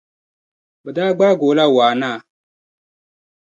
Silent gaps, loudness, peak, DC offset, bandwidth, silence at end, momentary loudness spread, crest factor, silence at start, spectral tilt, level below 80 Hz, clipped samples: none; -15 LUFS; -2 dBFS; under 0.1%; 7.6 kHz; 1.2 s; 13 LU; 16 dB; 0.85 s; -6 dB/octave; -70 dBFS; under 0.1%